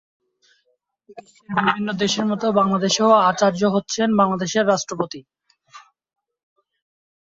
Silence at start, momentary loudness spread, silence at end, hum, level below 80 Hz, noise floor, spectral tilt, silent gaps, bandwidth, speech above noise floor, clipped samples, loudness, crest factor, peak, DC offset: 1.15 s; 10 LU; 1.6 s; none; -62 dBFS; -69 dBFS; -4.5 dB/octave; none; 7.8 kHz; 50 dB; under 0.1%; -19 LUFS; 18 dB; -2 dBFS; under 0.1%